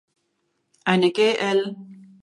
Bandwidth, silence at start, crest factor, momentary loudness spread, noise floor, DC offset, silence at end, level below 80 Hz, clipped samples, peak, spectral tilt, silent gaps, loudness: 11.5 kHz; 0.85 s; 20 dB; 13 LU; -73 dBFS; under 0.1%; 0.3 s; -72 dBFS; under 0.1%; -4 dBFS; -5.5 dB/octave; none; -21 LUFS